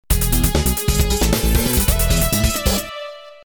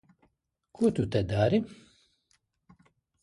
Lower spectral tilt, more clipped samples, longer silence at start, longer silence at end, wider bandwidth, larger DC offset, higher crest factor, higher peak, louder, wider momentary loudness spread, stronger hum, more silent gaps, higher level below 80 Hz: second, -4 dB/octave vs -7.5 dB/octave; neither; second, 0.1 s vs 0.8 s; second, 0.1 s vs 1.5 s; first, over 20 kHz vs 11.5 kHz; neither; about the same, 16 dB vs 20 dB; first, -2 dBFS vs -12 dBFS; first, -17 LUFS vs -28 LUFS; about the same, 6 LU vs 4 LU; neither; neither; first, -20 dBFS vs -54 dBFS